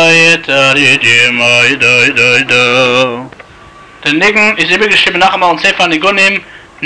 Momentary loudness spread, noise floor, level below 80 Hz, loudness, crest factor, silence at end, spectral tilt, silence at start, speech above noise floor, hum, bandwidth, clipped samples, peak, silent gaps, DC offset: 4 LU; -35 dBFS; -46 dBFS; -7 LUFS; 8 dB; 0 s; -3 dB/octave; 0 s; 27 dB; none; 12 kHz; under 0.1%; 0 dBFS; none; 0.6%